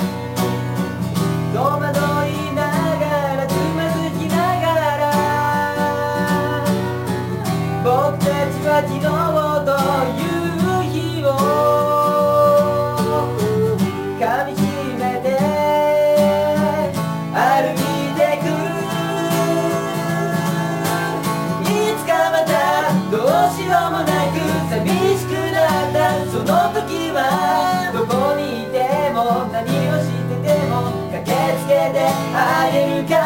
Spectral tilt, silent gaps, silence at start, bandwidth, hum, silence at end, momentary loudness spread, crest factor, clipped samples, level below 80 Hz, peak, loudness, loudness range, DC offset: -6 dB/octave; none; 0 s; 16.5 kHz; none; 0 s; 6 LU; 14 dB; under 0.1%; -54 dBFS; -4 dBFS; -18 LUFS; 3 LU; under 0.1%